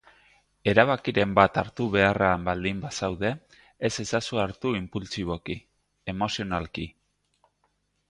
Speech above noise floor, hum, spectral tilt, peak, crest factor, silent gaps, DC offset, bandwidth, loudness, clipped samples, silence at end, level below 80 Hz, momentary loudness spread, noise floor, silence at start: 47 dB; 50 Hz at -50 dBFS; -5 dB/octave; -2 dBFS; 26 dB; none; under 0.1%; 11 kHz; -26 LUFS; under 0.1%; 1.2 s; -50 dBFS; 15 LU; -72 dBFS; 0.65 s